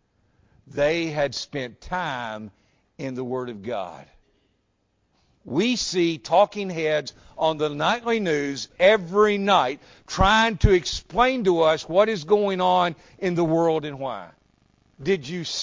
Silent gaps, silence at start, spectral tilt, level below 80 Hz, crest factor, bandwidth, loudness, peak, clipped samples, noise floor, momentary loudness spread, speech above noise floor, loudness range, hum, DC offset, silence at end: none; 0.75 s; -5 dB/octave; -40 dBFS; 20 dB; 7.6 kHz; -23 LUFS; -4 dBFS; under 0.1%; -70 dBFS; 14 LU; 47 dB; 11 LU; none; under 0.1%; 0 s